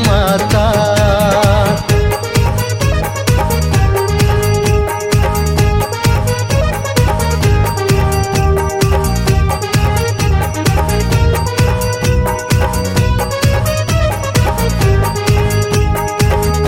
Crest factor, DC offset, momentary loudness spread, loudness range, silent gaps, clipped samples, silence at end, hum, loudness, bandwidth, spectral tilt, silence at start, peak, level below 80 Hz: 12 dB; under 0.1%; 3 LU; 1 LU; none; under 0.1%; 0 s; none; -13 LUFS; 17 kHz; -5.5 dB/octave; 0 s; 0 dBFS; -20 dBFS